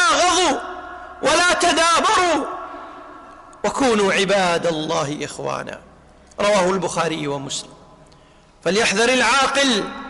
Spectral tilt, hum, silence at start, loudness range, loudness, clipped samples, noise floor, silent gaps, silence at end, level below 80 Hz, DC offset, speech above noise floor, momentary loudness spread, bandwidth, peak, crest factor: -2.5 dB/octave; none; 0 s; 5 LU; -18 LUFS; under 0.1%; -50 dBFS; none; 0 s; -50 dBFS; under 0.1%; 31 dB; 18 LU; 11.5 kHz; -8 dBFS; 12 dB